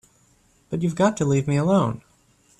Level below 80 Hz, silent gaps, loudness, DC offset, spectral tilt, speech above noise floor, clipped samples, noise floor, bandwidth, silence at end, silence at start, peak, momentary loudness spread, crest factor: -56 dBFS; none; -22 LUFS; under 0.1%; -7 dB/octave; 39 dB; under 0.1%; -60 dBFS; 11 kHz; 0.6 s; 0.7 s; -6 dBFS; 10 LU; 18 dB